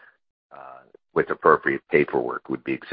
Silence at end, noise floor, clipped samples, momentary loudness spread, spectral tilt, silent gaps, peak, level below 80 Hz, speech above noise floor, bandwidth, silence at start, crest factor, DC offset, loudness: 0 s; -47 dBFS; under 0.1%; 13 LU; -10.5 dB/octave; none; -2 dBFS; -62 dBFS; 25 dB; 5 kHz; 0.65 s; 22 dB; under 0.1%; -23 LUFS